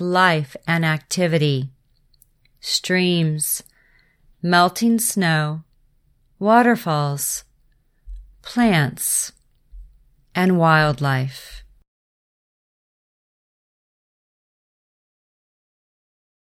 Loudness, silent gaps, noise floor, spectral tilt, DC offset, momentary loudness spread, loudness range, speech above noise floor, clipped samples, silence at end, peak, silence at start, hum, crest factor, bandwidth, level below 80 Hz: -19 LUFS; none; -60 dBFS; -4.5 dB/octave; under 0.1%; 14 LU; 4 LU; 41 dB; under 0.1%; 4.9 s; -2 dBFS; 0 s; none; 20 dB; 16.5 kHz; -50 dBFS